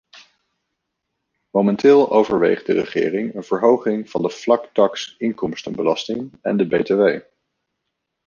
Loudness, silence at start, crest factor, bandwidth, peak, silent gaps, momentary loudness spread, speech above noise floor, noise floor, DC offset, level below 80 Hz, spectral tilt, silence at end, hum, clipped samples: -19 LUFS; 0.15 s; 18 dB; 7.2 kHz; -2 dBFS; none; 11 LU; 59 dB; -77 dBFS; under 0.1%; -60 dBFS; -6 dB/octave; 1.05 s; none; under 0.1%